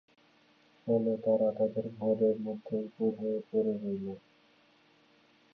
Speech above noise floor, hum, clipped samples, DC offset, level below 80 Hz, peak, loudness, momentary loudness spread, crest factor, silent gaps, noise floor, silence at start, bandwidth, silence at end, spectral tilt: 34 dB; none; under 0.1%; under 0.1%; -76 dBFS; -16 dBFS; -32 LUFS; 9 LU; 16 dB; none; -65 dBFS; 0.85 s; 5.2 kHz; 1.35 s; -10.5 dB/octave